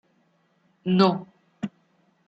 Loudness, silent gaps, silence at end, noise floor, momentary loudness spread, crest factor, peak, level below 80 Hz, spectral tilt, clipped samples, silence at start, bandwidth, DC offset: -25 LUFS; none; 0.6 s; -66 dBFS; 16 LU; 24 dB; -4 dBFS; -70 dBFS; -8 dB/octave; under 0.1%; 0.85 s; 7.2 kHz; under 0.1%